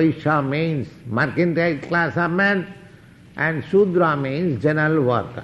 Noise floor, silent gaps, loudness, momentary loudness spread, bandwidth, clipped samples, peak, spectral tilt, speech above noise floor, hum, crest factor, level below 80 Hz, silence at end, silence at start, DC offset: -46 dBFS; none; -20 LUFS; 7 LU; 7.8 kHz; under 0.1%; -6 dBFS; -8.5 dB/octave; 26 dB; none; 14 dB; -56 dBFS; 0 s; 0 s; under 0.1%